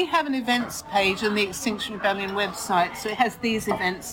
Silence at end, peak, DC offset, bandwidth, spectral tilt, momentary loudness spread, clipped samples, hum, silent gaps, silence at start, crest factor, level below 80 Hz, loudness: 0 s; -8 dBFS; under 0.1%; over 20 kHz; -3.5 dB/octave; 4 LU; under 0.1%; none; none; 0 s; 18 dB; -54 dBFS; -24 LUFS